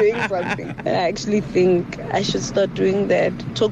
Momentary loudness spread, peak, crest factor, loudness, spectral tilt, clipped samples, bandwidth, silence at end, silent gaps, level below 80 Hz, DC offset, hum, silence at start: 6 LU; -8 dBFS; 12 dB; -20 LUFS; -5.5 dB/octave; under 0.1%; 9.2 kHz; 0 s; none; -46 dBFS; under 0.1%; none; 0 s